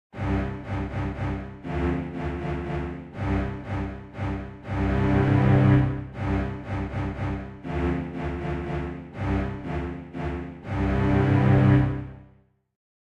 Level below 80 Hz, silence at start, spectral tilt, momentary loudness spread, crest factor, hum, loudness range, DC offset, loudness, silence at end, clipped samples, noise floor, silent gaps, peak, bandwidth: -36 dBFS; 0.15 s; -9 dB/octave; 13 LU; 18 dB; none; 6 LU; under 0.1%; -26 LUFS; 0.85 s; under 0.1%; -58 dBFS; none; -6 dBFS; 6.4 kHz